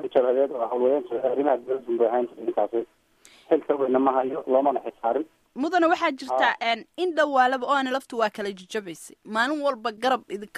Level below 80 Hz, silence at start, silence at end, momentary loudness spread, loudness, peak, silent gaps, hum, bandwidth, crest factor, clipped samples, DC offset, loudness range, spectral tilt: -72 dBFS; 0 s; 0 s; 9 LU; -24 LUFS; -6 dBFS; none; none; 13.5 kHz; 18 dB; under 0.1%; under 0.1%; 2 LU; -4 dB/octave